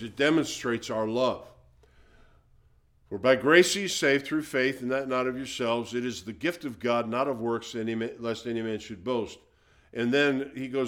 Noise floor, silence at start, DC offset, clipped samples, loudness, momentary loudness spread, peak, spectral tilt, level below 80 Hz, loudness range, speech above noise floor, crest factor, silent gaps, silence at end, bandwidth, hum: -62 dBFS; 0 s; under 0.1%; under 0.1%; -27 LUFS; 9 LU; -6 dBFS; -4 dB/octave; -62 dBFS; 6 LU; 34 dB; 22 dB; none; 0 s; 18 kHz; none